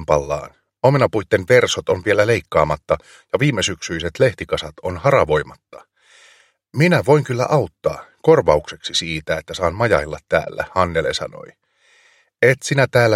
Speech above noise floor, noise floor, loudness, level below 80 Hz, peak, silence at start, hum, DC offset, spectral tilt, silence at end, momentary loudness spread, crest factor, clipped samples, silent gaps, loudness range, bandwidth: 38 dB; -55 dBFS; -18 LUFS; -42 dBFS; 0 dBFS; 0 s; none; under 0.1%; -5 dB/octave; 0 s; 10 LU; 18 dB; under 0.1%; none; 3 LU; 15 kHz